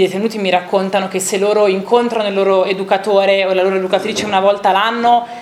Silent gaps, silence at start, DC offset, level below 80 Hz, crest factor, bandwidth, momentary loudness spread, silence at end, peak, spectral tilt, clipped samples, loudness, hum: none; 0 s; under 0.1%; -62 dBFS; 14 dB; 15.5 kHz; 4 LU; 0 s; 0 dBFS; -4 dB/octave; under 0.1%; -14 LUFS; none